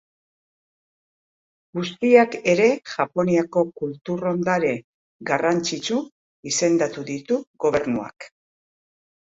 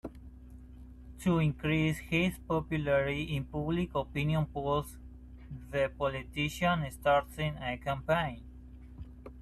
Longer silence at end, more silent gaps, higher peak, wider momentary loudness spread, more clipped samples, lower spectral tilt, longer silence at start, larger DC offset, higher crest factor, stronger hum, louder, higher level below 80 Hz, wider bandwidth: first, 1 s vs 0 s; first, 4.01-4.05 s, 4.84-5.20 s, 6.12-6.43 s, 7.47-7.54 s vs none; first, -2 dBFS vs -16 dBFS; second, 14 LU vs 22 LU; neither; second, -4.5 dB/octave vs -6.5 dB/octave; first, 1.75 s vs 0.05 s; neither; about the same, 22 dB vs 18 dB; neither; first, -22 LUFS vs -32 LUFS; second, -62 dBFS vs -48 dBFS; second, 8.2 kHz vs 13 kHz